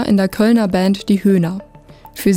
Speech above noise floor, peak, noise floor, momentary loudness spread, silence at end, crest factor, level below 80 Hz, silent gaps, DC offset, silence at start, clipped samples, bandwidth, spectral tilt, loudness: 27 dB; -4 dBFS; -41 dBFS; 11 LU; 0 s; 12 dB; -44 dBFS; none; under 0.1%; 0 s; under 0.1%; 17 kHz; -6.5 dB/octave; -15 LUFS